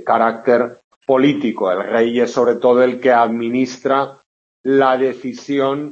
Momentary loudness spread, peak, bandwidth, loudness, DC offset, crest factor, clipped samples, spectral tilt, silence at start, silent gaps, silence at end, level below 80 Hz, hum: 8 LU; -2 dBFS; 7.6 kHz; -16 LUFS; under 0.1%; 14 dB; under 0.1%; -6 dB/octave; 0 s; 0.84-1.01 s, 4.26-4.64 s; 0 s; -66 dBFS; none